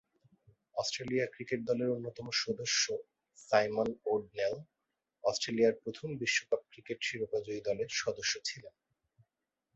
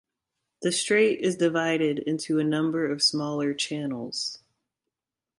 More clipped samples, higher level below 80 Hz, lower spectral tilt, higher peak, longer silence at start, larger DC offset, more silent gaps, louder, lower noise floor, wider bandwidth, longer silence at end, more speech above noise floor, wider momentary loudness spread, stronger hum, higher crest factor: neither; about the same, -72 dBFS vs -72 dBFS; second, -2.5 dB/octave vs -4 dB/octave; about the same, -12 dBFS vs -10 dBFS; first, 0.75 s vs 0.6 s; neither; neither; second, -34 LUFS vs -25 LUFS; about the same, -88 dBFS vs -87 dBFS; second, 8 kHz vs 11.5 kHz; about the same, 1.05 s vs 1.05 s; second, 53 dB vs 61 dB; about the same, 9 LU vs 9 LU; neither; first, 24 dB vs 16 dB